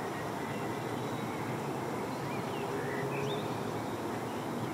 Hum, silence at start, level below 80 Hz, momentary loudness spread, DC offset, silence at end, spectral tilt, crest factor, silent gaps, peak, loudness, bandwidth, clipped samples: none; 0 s; -68 dBFS; 2 LU; under 0.1%; 0 s; -5.5 dB/octave; 12 dB; none; -24 dBFS; -36 LUFS; 16 kHz; under 0.1%